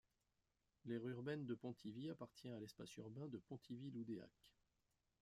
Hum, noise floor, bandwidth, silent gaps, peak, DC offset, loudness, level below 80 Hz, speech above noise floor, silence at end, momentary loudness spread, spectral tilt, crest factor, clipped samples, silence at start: none; -88 dBFS; 14.5 kHz; none; -36 dBFS; under 0.1%; -53 LUFS; -86 dBFS; 36 dB; 0.7 s; 8 LU; -7 dB/octave; 18 dB; under 0.1%; 0.85 s